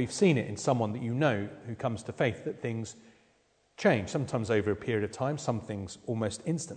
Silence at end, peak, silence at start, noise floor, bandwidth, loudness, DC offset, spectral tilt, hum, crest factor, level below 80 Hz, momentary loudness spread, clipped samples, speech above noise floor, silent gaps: 0 s; -12 dBFS; 0 s; -69 dBFS; 9.4 kHz; -31 LUFS; under 0.1%; -6 dB/octave; none; 20 dB; -64 dBFS; 10 LU; under 0.1%; 38 dB; none